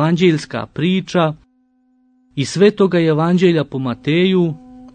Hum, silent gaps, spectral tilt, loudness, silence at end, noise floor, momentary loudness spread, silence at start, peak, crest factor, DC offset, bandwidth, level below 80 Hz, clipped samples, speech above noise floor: none; none; -6.5 dB/octave; -16 LUFS; 0.05 s; -59 dBFS; 11 LU; 0 s; -2 dBFS; 14 dB; under 0.1%; 9.4 kHz; -54 dBFS; under 0.1%; 44 dB